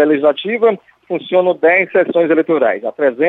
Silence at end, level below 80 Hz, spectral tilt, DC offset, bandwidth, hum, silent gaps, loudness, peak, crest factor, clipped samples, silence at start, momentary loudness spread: 0 s; -66 dBFS; -8 dB/octave; under 0.1%; 4 kHz; none; none; -14 LUFS; -2 dBFS; 12 dB; under 0.1%; 0 s; 7 LU